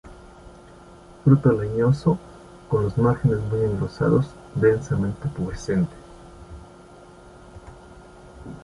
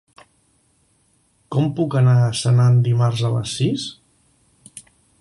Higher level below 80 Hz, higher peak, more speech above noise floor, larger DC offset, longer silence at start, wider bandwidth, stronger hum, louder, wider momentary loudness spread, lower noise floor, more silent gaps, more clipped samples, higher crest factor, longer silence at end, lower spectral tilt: first, -44 dBFS vs -54 dBFS; about the same, -4 dBFS vs -6 dBFS; second, 25 dB vs 45 dB; neither; second, 0.05 s vs 1.5 s; about the same, 11 kHz vs 11.5 kHz; neither; second, -22 LUFS vs -18 LUFS; first, 24 LU vs 18 LU; second, -46 dBFS vs -62 dBFS; neither; neither; first, 20 dB vs 14 dB; second, 0.05 s vs 0.4 s; first, -9 dB/octave vs -6.5 dB/octave